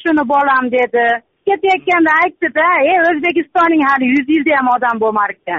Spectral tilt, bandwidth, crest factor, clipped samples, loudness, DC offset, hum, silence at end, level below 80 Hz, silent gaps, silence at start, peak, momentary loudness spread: -1.5 dB/octave; 7.6 kHz; 10 dB; under 0.1%; -13 LUFS; under 0.1%; none; 0 s; -56 dBFS; none; 0 s; -4 dBFS; 4 LU